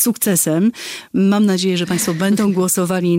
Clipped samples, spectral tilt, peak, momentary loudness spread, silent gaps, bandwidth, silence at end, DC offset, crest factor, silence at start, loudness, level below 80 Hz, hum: under 0.1%; -4.5 dB/octave; -2 dBFS; 4 LU; none; 16.5 kHz; 0 s; under 0.1%; 14 dB; 0 s; -16 LUFS; -56 dBFS; none